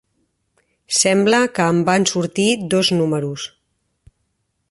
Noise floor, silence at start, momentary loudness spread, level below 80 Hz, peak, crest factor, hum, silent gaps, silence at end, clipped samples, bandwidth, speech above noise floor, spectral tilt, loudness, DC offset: -70 dBFS; 0.9 s; 9 LU; -60 dBFS; 0 dBFS; 18 dB; none; none; 1.25 s; under 0.1%; 11.5 kHz; 53 dB; -4 dB/octave; -17 LUFS; under 0.1%